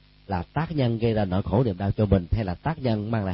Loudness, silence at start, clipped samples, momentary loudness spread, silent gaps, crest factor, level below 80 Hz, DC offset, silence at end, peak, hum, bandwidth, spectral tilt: -25 LUFS; 0.3 s; under 0.1%; 6 LU; none; 18 dB; -38 dBFS; under 0.1%; 0 s; -6 dBFS; none; 5.8 kHz; -12.5 dB/octave